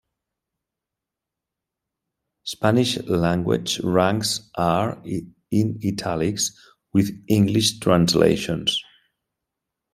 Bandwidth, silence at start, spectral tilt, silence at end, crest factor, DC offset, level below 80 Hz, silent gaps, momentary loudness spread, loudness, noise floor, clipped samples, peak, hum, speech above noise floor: 16 kHz; 2.45 s; -5 dB/octave; 1.1 s; 20 dB; under 0.1%; -54 dBFS; none; 8 LU; -21 LUFS; -86 dBFS; under 0.1%; -2 dBFS; none; 65 dB